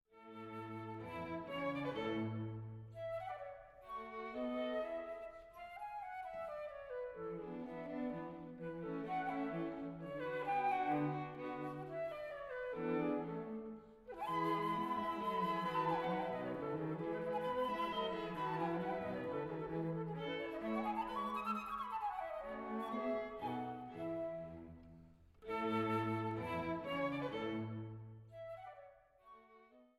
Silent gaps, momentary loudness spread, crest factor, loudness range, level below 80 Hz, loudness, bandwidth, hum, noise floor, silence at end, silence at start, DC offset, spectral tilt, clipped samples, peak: none; 13 LU; 16 dB; 6 LU; -70 dBFS; -42 LUFS; 15.5 kHz; none; -65 dBFS; 0.1 s; 0.15 s; under 0.1%; -7.5 dB/octave; under 0.1%; -26 dBFS